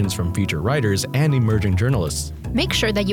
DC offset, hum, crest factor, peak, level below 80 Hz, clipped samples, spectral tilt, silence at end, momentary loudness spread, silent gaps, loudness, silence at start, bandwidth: under 0.1%; none; 14 dB; -6 dBFS; -34 dBFS; under 0.1%; -5.5 dB/octave; 0 s; 5 LU; none; -20 LUFS; 0 s; 18 kHz